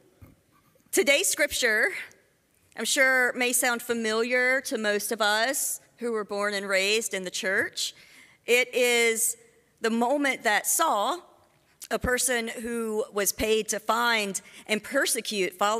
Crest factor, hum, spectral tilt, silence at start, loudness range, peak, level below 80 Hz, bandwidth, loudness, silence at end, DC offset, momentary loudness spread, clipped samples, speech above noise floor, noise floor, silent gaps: 18 dB; none; -1.5 dB/octave; 0.2 s; 3 LU; -8 dBFS; -56 dBFS; 16 kHz; -25 LUFS; 0 s; under 0.1%; 10 LU; under 0.1%; 40 dB; -65 dBFS; none